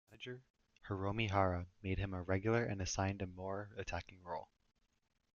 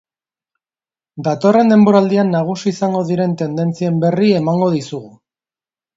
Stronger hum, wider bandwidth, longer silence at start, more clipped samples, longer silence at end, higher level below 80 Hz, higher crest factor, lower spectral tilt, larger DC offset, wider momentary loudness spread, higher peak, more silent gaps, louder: neither; about the same, 7.2 kHz vs 7.8 kHz; second, 0.1 s vs 1.15 s; neither; about the same, 0.9 s vs 0.9 s; about the same, -60 dBFS vs -62 dBFS; first, 22 dB vs 16 dB; second, -5.5 dB/octave vs -7.5 dB/octave; neither; about the same, 13 LU vs 11 LU; second, -20 dBFS vs 0 dBFS; first, 0.50-0.54 s vs none; second, -40 LUFS vs -15 LUFS